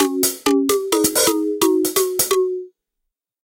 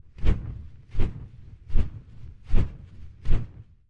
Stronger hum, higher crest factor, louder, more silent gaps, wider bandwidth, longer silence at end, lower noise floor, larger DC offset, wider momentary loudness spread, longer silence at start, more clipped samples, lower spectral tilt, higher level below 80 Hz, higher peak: neither; about the same, 16 dB vs 18 dB; first, -17 LUFS vs -32 LUFS; neither; first, 17.5 kHz vs 3.7 kHz; first, 0.8 s vs 0.45 s; first, -79 dBFS vs -43 dBFS; neither; second, 3 LU vs 18 LU; second, 0 s vs 0.2 s; neither; second, -2 dB/octave vs -8.5 dB/octave; second, -56 dBFS vs -28 dBFS; about the same, -4 dBFS vs -6 dBFS